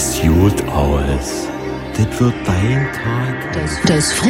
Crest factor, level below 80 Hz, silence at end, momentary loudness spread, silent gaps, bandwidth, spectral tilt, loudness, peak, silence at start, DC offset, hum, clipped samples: 14 dB; -28 dBFS; 0 s; 9 LU; none; 16.5 kHz; -5 dB/octave; -17 LUFS; -2 dBFS; 0 s; under 0.1%; none; under 0.1%